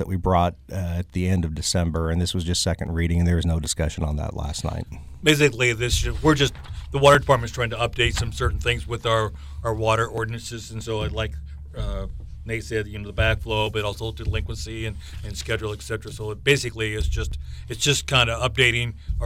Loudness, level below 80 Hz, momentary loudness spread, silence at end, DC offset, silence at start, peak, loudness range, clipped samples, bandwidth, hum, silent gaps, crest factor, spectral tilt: -23 LUFS; -32 dBFS; 13 LU; 0 s; under 0.1%; 0 s; -6 dBFS; 7 LU; under 0.1%; 16 kHz; none; none; 18 dB; -4.5 dB/octave